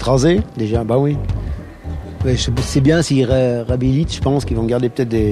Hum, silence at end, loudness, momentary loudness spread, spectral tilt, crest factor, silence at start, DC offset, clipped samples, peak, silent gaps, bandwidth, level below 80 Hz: none; 0 s; -17 LUFS; 11 LU; -6.5 dB/octave; 16 dB; 0 s; under 0.1%; under 0.1%; 0 dBFS; none; 13 kHz; -28 dBFS